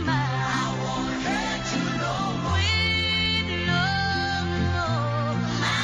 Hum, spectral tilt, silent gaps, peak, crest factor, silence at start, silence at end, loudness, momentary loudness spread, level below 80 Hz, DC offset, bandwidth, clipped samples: none; -4.5 dB/octave; none; -12 dBFS; 14 dB; 0 s; 0 s; -24 LUFS; 5 LU; -42 dBFS; under 0.1%; 10.5 kHz; under 0.1%